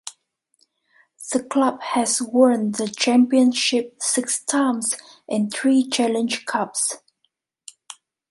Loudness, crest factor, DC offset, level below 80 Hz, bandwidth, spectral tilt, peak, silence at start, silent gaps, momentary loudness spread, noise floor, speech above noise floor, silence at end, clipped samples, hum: -20 LUFS; 18 dB; under 0.1%; -72 dBFS; 11.5 kHz; -2.5 dB/octave; -4 dBFS; 0.05 s; none; 16 LU; -72 dBFS; 52 dB; 0.4 s; under 0.1%; none